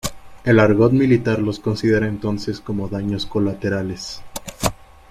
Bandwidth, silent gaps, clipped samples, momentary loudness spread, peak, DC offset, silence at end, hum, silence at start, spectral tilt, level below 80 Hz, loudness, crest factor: 16 kHz; none; under 0.1%; 14 LU; -2 dBFS; under 0.1%; 0.35 s; none; 0.05 s; -6 dB/octave; -42 dBFS; -19 LUFS; 16 dB